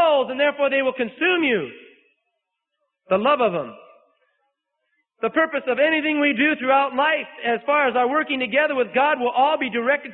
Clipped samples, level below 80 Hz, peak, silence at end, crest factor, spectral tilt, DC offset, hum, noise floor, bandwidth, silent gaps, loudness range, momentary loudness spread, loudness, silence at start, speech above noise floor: under 0.1%; -70 dBFS; -6 dBFS; 0 s; 16 dB; -9 dB/octave; under 0.1%; none; -79 dBFS; 4.2 kHz; none; 6 LU; 6 LU; -20 LUFS; 0 s; 58 dB